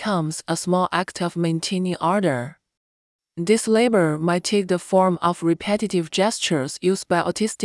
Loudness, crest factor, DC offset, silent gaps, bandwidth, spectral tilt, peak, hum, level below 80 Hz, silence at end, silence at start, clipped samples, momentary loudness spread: -21 LUFS; 16 dB; under 0.1%; 2.77-3.19 s; 12 kHz; -5 dB/octave; -6 dBFS; none; -64 dBFS; 0 s; 0 s; under 0.1%; 6 LU